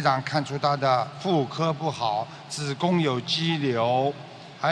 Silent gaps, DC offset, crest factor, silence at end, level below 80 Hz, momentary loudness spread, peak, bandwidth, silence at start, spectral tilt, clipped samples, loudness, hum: none; under 0.1%; 18 dB; 0 s; -68 dBFS; 8 LU; -6 dBFS; 11 kHz; 0 s; -5.5 dB/octave; under 0.1%; -25 LUFS; none